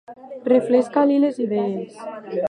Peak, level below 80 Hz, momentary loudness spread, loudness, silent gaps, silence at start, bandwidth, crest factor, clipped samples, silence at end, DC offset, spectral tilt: -4 dBFS; -70 dBFS; 16 LU; -20 LUFS; none; 0.1 s; 10 kHz; 16 dB; under 0.1%; 0.05 s; under 0.1%; -7.5 dB/octave